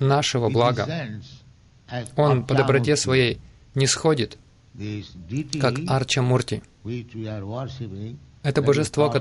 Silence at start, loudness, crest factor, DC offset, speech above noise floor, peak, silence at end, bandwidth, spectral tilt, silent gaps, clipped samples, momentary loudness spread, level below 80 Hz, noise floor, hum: 0 s; -23 LUFS; 18 dB; under 0.1%; 30 dB; -4 dBFS; 0 s; 11.5 kHz; -5 dB/octave; none; under 0.1%; 15 LU; -52 dBFS; -52 dBFS; none